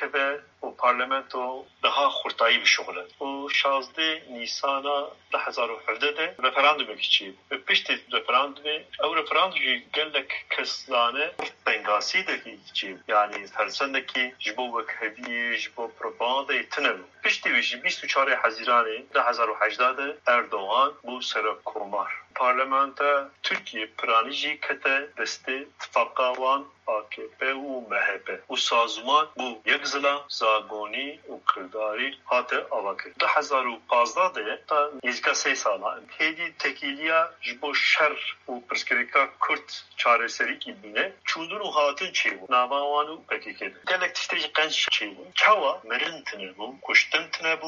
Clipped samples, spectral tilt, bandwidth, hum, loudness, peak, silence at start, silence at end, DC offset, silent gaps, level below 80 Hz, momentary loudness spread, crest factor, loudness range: under 0.1%; 2.5 dB/octave; 7.6 kHz; none; -25 LUFS; -4 dBFS; 0 s; 0 s; under 0.1%; none; -80 dBFS; 10 LU; 22 dB; 3 LU